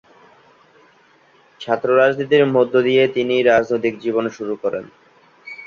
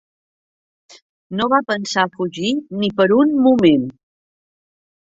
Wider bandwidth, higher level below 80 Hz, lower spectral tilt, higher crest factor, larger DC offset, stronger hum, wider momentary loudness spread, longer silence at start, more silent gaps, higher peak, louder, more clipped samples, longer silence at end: second, 7 kHz vs 7.8 kHz; about the same, -62 dBFS vs -58 dBFS; about the same, -6.5 dB/octave vs -5.5 dB/octave; about the same, 18 dB vs 16 dB; neither; neither; about the same, 10 LU vs 9 LU; first, 1.6 s vs 1.3 s; neither; about the same, -2 dBFS vs -2 dBFS; about the same, -17 LUFS vs -17 LUFS; neither; second, 0 s vs 1.15 s